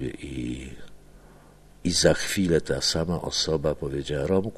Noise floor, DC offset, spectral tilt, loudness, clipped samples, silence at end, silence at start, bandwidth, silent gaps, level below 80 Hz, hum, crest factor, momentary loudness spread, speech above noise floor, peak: -51 dBFS; under 0.1%; -4 dB/octave; -25 LUFS; under 0.1%; 0 s; 0 s; 13 kHz; none; -44 dBFS; 50 Hz at -50 dBFS; 22 dB; 12 LU; 26 dB; -4 dBFS